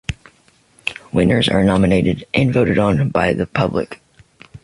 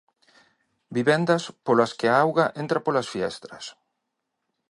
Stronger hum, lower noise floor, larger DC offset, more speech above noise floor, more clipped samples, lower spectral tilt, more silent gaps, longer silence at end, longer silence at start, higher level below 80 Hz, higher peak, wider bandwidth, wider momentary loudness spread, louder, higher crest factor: neither; second, -54 dBFS vs -80 dBFS; neither; second, 39 dB vs 57 dB; neither; first, -7 dB/octave vs -5.5 dB/octave; neither; second, 0.05 s vs 1 s; second, 0.1 s vs 0.9 s; first, -38 dBFS vs -68 dBFS; about the same, -2 dBFS vs -4 dBFS; about the same, 11.5 kHz vs 11.5 kHz; second, 12 LU vs 17 LU; first, -17 LUFS vs -23 LUFS; about the same, 16 dB vs 20 dB